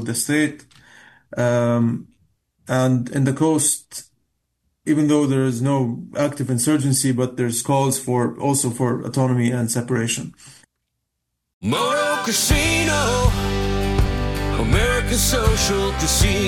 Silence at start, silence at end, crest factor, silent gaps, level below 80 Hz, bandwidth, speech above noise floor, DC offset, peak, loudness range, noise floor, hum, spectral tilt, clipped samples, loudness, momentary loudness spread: 0 s; 0 s; 16 dB; 11.53-11.61 s; -30 dBFS; 17.5 kHz; 58 dB; under 0.1%; -4 dBFS; 3 LU; -77 dBFS; none; -4.5 dB/octave; under 0.1%; -20 LUFS; 6 LU